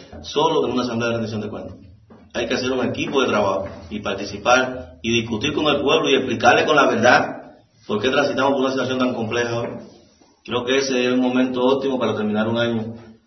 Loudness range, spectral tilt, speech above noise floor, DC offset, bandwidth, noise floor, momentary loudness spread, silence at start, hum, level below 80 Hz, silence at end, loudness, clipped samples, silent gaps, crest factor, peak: 5 LU; -4.5 dB/octave; 33 dB; under 0.1%; 6.2 kHz; -52 dBFS; 13 LU; 0 s; none; -54 dBFS; 0.15 s; -20 LUFS; under 0.1%; none; 20 dB; 0 dBFS